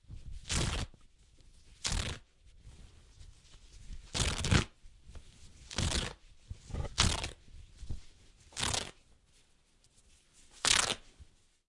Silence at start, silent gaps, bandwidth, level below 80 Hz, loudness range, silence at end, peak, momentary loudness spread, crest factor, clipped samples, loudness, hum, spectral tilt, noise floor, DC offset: 0.1 s; none; 11.5 kHz; -46 dBFS; 7 LU; 0.45 s; -6 dBFS; 25 LU; 32 dB; under 0.1%; -34 LUFS; none; -2.5 dB/octave; -67 dBFS; under 0.1%